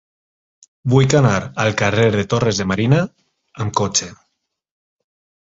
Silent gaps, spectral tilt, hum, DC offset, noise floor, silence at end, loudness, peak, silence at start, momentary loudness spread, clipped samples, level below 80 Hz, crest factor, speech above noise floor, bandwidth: none; -5 dB/octave; none; under 0.1%; -72 dBFS; 1.3 s; -17 LUFS; -2 dBFS; 0.85 s; 12 LU; under 0.1%; -46 dBFS; 18 dB; 56 dB; 8 kHz